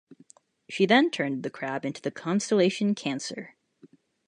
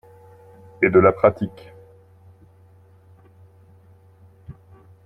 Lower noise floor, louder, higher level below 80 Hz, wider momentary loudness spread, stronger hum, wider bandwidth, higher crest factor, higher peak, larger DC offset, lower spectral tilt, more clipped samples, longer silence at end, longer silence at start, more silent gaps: first, -58 dBFS vs -51 dBFS; second, -26 LUFS vs -18 LUFS; second, -78 dBFS vs -56 dBFS; about the same, 15 LU vs 16 LU; neither; first, 10.5 kHz vs 4.4 kHz; about the same, 22 dB vs 22 dB; second, -6 dBFS vs -2 dBFS; neither; second, -4.5 dB/octave vs -10 dB/octave; neither; first, 0.8 s vs 0.55 s; about the same, 0.7 s vs 0.8 s; neither